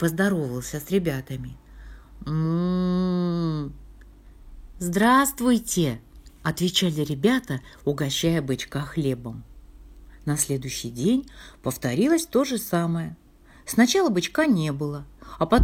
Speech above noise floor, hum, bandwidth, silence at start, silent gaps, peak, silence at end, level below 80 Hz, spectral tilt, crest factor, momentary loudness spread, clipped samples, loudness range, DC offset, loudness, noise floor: 24 dB; none; 17.5 kHz; 0 s; none; -4 dBFS; 0 s; -48 dBFS; -5 dB/octave; 20 dB; 14 LU; under 0.1%; 5 LU; under 0.1%; -24 LUFS; -47 dBFS